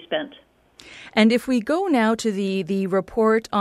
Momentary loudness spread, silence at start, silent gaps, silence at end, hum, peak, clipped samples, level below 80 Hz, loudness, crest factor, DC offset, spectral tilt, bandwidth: 10 LU; 0 s; none; 0 s; none; -4 dBFS; under 0.1%; -58 dBFS; -21 LUFS; 16 dB; under 0.1%; -5.5 dB/octave; 13.5 kHz